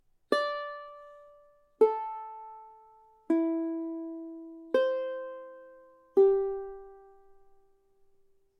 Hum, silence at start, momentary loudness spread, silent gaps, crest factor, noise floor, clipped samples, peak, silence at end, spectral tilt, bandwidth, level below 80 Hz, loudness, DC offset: none; 0.3 s; 23 LU; none; 22 dB; -65 dBFS; under 0.1%; -10 dBFS; 1.6 s; -4.5 dB/octave; 10.5 kHz; -66 dBFS; -30 LUFS; under 0.1%